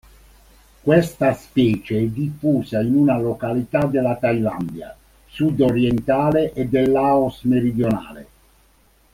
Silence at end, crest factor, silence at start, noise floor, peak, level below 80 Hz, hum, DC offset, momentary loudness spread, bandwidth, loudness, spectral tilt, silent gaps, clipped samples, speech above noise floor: 0.9 s; 18 dB; 0.85 s; -56 dBFS; -2 dBFS; -48 dBFS; none; under 0.1%; 9 LU; 16 kHz; -19 LUFS; -8 dB/octave; none; under 0.1%; 37 dB